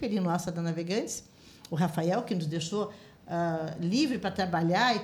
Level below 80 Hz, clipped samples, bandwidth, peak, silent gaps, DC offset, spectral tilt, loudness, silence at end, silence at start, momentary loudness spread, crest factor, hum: -64 dBFS; under 0.1%; 19 kHz; -14 dBFS; none; under 0.1%; -5.5 dB/octave; -30 LUFS; 0 s; 0 s; 10 LU; 16 dB; none